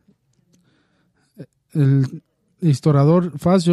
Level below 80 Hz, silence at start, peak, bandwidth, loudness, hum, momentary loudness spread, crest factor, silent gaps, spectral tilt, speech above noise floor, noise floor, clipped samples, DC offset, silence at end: -56 dBFS; 1.4 s; -4 dBFS; 12 kHz; -18 LUFS; none; 11 LU; 16 dB; none; -8.5 dB/octave; 48 dB; -63 dBFS; under 0.1%; under 0.1%; 0 s